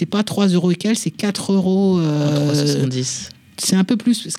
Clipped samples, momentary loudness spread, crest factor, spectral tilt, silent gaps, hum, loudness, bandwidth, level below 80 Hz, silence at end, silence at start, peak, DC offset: under 0.1%; 6 LU; 14 dB; -5.5 dB/octave; none; none; -18 LUFS; 15.5 kHz; -60 dBFS; 0 s; 0 s; -2 dBFS; under 0.1%